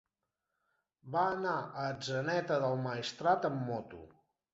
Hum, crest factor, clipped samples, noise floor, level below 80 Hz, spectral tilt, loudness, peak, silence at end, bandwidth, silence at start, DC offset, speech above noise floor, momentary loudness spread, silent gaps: none; 20 dB; under 0.1%; -87 dBFS; -72 dBFS; -4 dB/octave; -35 LUFS; -16 dBFS; 0.45 s; 7.6 kHz; 1.05 s; under 0.1%; 53 dB; 8 LU; none